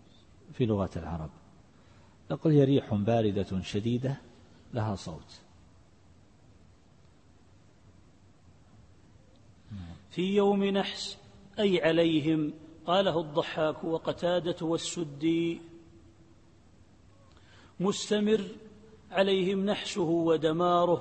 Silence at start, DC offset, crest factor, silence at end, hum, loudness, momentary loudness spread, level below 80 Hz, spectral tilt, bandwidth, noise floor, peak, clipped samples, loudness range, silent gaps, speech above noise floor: 0.5 s; under 0.1%; 18 dB; 0 s; none; -29 LUFS; 16 LU; -60 dBFS; -6 dB/octave; 8.8 kHz; -60 dBFS; -12 dBFS; under 0.1%; 9 LU; none; 32 dB